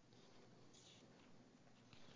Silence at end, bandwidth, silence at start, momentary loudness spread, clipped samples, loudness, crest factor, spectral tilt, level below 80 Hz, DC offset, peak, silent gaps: 0 s; 8 kHz; 0 s; 4 LU; under 0.1%; -67 LUFS; 20 dB; -4 dB/octave; -88 dBFS; under 0.1%; -46 dBFS; none